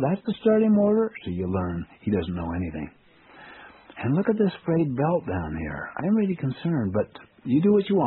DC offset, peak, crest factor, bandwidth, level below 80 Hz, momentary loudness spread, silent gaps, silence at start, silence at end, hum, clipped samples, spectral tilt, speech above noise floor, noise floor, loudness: under 0.1%; -8 dBFS; 16 dB; 4.2 kHz; -50 dBFS; 12 LU; none; 0 s; 0 s; none; under 0.1%; -7.5 dB/octave; 26 dB; -50 dBFS; -25 LUFS